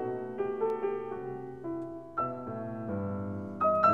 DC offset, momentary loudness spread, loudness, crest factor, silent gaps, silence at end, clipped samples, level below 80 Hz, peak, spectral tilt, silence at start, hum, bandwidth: 0.1%; 9 LU; -34 LUFS; 20 dB; none; 0 s; under 0.1%; -68 dBFS; -12 dBFS; -9.5 dB/octave; 0 s; none; 7.2 kHz